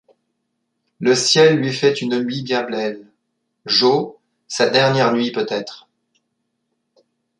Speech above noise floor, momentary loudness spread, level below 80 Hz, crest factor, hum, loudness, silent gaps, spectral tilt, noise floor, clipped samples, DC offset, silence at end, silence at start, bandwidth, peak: 56 dB; 15 LU; -66 dBFS; 18 dB; none; -17 LUFS; none; -4 dB/octave; -73 dBFS; under 0.1%; under 0.1%; 1.6 s; 1 s; 11 kHz; -2 dBFS